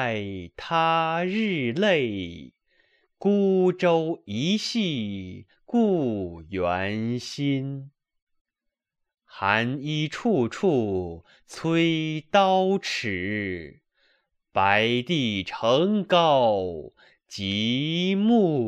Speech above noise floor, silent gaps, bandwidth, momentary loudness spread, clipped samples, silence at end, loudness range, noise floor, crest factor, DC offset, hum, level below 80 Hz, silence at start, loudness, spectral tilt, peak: 59 dB; 8.22-8.27 s, 8.41-8.45 s; 10.5 kHz; 13 LU; under 0.1%; 0 s; 5 LU; -83 dBFS; 20 dB; under 0.1%; none; -60 dBFS; 0 s; -24 LUFS; -6 dB/octave; -4 dBFS